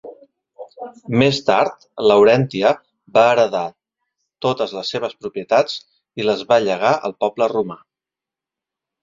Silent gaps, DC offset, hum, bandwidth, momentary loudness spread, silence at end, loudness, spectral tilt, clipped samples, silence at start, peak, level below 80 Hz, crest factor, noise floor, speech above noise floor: none; under 0.1%; none; 7.6 kHz; 15 LU; 1.25 s; -18 LUFS; -5.5 dB/octave; under 0.1%; 0.05 s; 0 dBFS; -60 dBFS; 18 dB; -88 dBFS; 71 dB